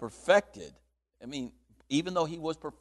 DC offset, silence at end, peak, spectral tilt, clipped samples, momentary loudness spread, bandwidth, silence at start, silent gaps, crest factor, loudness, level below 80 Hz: under 0.1%; 0.1 s; -12 dBFS; -4.5 dB/octave; under 0.1%; 22 LU; 12 kHz; 0 s; none; 20 dB; -30 LUFS; -64 dBFS